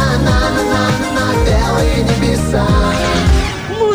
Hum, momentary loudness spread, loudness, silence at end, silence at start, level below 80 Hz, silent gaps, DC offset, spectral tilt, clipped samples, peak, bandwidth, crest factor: none; 2 LU; -14 LUFS; 0 s; 0 s; -18 dBFS; none; under 0.1%; -5.5 dB/octave; under 0.1%; -2 dBFS; over 20 kHz; 12 dB